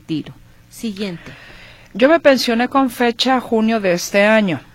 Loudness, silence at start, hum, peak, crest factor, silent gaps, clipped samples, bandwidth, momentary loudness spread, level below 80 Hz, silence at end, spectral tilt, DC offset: -15 LUFS; 0.1 s; none; -2 dBFS; 16 dB; none; under 0.1%; 16.5 kHz; 16 LU; -50 dBFS; 0.15 s; -4.5 dB/octave; under 0.1%